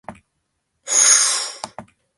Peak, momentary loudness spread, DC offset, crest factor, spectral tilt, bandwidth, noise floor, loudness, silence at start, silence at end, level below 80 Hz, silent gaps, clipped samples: 0 dBFS; 22 LU; under 0.1%; 20 dB; 2.5 dB/octave; 12 kHz; -73 dBFS; -13 LUFS; 0.1 s; 0.35 s; -64 dBFS; none; under 0.1%